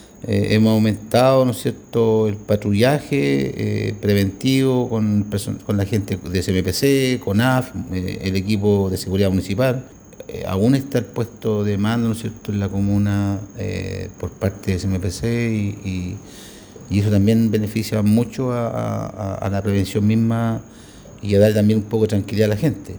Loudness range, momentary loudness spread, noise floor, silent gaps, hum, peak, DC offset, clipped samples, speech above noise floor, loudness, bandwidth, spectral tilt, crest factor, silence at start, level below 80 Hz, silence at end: 4 LU; 10 LU; -41 dBFS; none; none; -2 dBFS; under 0.1%; under 0.1%; 22 dB; -20 LUFS; over 20 kHz; -6.5 dB/octave; 18 dB; 0 s; -48 dBFS; 0 s